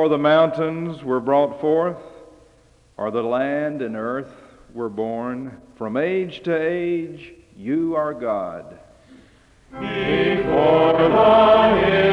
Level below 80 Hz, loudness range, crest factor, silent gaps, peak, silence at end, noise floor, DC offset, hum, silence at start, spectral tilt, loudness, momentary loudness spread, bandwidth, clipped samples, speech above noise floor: -50 dBFS; 9 LU; 16 dB; none; -4 dBFS; 0 s; -54 dBFS; under 0.1%; none; 0 s; -7.5 dB/octave; -19 LUFS; 18 LU; 7.6 kHz; under 0.1%; 35 dB